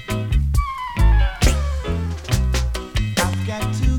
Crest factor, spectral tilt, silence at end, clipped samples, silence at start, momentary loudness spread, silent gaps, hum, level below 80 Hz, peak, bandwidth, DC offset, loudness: 16 dB; -5 dB/octave; 0 s; under 0.1%; 0 s; 7 LU; none; none; -20 dBFS; -2 dBFS; 18 kHz; under 0.1%; -21 LUFS